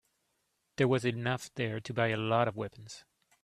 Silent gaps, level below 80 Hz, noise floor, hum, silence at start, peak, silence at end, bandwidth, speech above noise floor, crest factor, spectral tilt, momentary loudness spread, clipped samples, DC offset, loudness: none; -68 dBFS; -79 dBFS; none; 0.8 s; -12 dBFS; 0.45 s; 13.5 kHz; 47 dB; 22 dB; -6 dB/octave; 20 LU; under 0.1%; under 0.1%; -32 LUFS